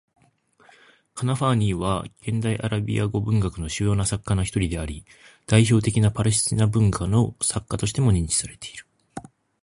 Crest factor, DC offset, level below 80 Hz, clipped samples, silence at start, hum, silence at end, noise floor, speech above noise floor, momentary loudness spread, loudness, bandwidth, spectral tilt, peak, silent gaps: 20 dB; under 0.1%; -40 dBFS; under 0.1%; 1.15 s; none; 0.4 s; -60 dBFS; 38 dB; 18 LU; -23 LUFS; 11.5 kHz; -5.5 dB/octave; -2 dBFS; none